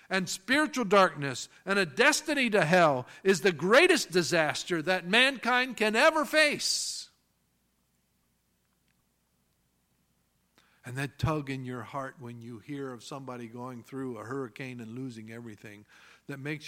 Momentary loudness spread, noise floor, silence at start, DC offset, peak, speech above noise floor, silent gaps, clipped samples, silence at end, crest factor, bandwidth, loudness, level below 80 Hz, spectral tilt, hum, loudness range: 18 LU; -74 dBFS; 0.1 s; under 0.1%; -6 dBFS; 45 dB; none; under 0.1%; 0 s; 24 dB; 16.5 kHz; -26 LUFS; -62 dBFS; -3.5 dB/octave; none; 16 LU